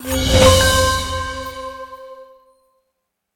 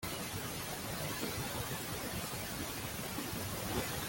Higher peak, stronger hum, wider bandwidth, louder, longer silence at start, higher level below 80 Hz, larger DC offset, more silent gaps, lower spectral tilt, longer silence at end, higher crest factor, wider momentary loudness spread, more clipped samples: first, 0 dBFS vs -22 dBFS; neither; about the same, 17.5 kHz vs 17 kHz; first, -14 LUFS vs -39 LUFS; about the same, 0 s vs 0 s; first, -28 dBFS vs -56 dBFS; neither; neither; about the same, -3.5 dB/octave vs -3.5 dB/octave; first, 1.1 s vs 0 s; about the same, 18 dB vs 18 dB; first, 23 LU vs 2 LU; neither